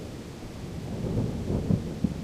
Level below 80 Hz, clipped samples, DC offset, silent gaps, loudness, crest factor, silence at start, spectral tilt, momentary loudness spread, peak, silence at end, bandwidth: -42 dBFS; under 0.1%; under 0.1%; none; -31 LUFS; 20 dB; 0 s; -8 dB/octave; 12 LU; -10 dBFS; 0 s; 15.5 kHz